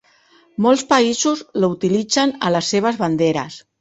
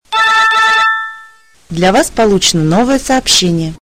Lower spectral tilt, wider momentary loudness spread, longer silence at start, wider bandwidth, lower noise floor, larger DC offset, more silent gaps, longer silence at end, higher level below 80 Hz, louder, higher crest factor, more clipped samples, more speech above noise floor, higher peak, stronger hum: about the same, -4 dB/octave vs -3.5 dB/octave; about the same, 6 LU vs 7 LU; first, 0.6 s vs 0.1 s; second, 8.2 kHz vs 16.5 kHz; first, -54 dBFS vs -41 dBFS; neither; neither; about the same, 0.2 s vs 0.1 s; second, -60 dBFS vs -36 dBFS; second, -18 LUFS vs -10 LUFS; about the same, 16 dB vs 12 dB; neither; first, 36 dB vs 30 dB; about the same, -2 dBFS vs 0 dBFS; neither